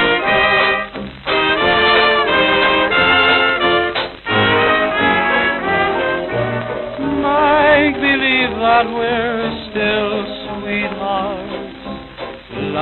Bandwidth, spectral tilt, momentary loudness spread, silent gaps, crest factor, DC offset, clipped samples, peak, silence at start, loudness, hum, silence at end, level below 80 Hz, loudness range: 4.5 kHz; -7.5 dB/octave; 14 LU; none; 14 dB; under 0.1%; under 0.1%; -2 dBFS; 0 s; -14 LUFS; none; 0 s; -42 dBFS; 7 LU